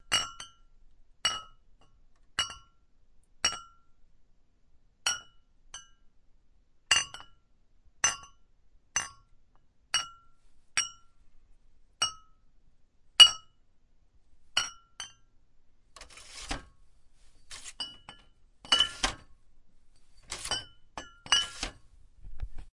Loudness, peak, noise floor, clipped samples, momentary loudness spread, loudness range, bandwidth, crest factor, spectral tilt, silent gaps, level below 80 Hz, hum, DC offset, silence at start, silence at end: -28 LUFS; -2 dBFS; -63 dBFS; under 0.1%; 22 LU; 14 LU; 11.5 kHz; 32 dB; 1 dB/octave; none; -54 dBFS; none; under 0.1%; 0.1 s; 0.05 s